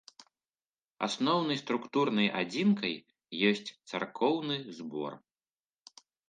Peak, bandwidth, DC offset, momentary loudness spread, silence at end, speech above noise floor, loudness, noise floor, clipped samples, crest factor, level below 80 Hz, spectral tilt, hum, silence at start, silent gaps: -12 dBFS; 9.4 kHz; under 0.1%; 11 LU; 1.15 s; over 59 dB; -31 LUFS; under -90 dBFS; under 0.1%; 20 dB; -80 dBFS; -5 dB/octave; none; 0.2 s; 0.67-0.71 s, 0.85-0.89 s